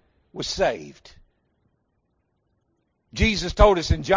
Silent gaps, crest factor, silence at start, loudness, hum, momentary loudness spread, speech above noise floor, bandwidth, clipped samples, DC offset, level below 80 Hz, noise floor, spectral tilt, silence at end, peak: none; 22 dB; 0.35 s; -21 LUFS; none; 19 LU; 51 dB; 7.6 kHz; under 0.1%; under 0.1%; -32 dBFS; -72 dBFS; -5 dB/octave; 0 s; -2 dBFS